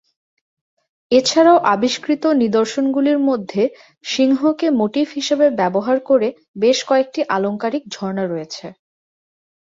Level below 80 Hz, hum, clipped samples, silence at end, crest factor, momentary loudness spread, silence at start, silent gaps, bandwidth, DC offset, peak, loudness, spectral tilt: -64 dBFS; none; under 0.1%; 0.9 s; 16 dB; 10 LU; 1.1 s; 6.48-6.54 s; 7.8 kHz; under 0.1%; -2 dBFS; -17 LUFS; -4.5 dB/octave